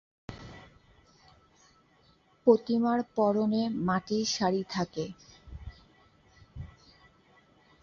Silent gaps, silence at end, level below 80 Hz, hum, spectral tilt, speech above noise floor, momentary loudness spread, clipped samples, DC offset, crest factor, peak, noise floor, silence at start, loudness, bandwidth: none; 1.15 s; -56 dBFS; none; -5.5 dB/octave; 37 dB; 24 LU; under 0.1%; under 0.1%; 22 dB; -10 dBFS; -64 dBFS; 0.3 s; -29 LUFS; 7.4 kHz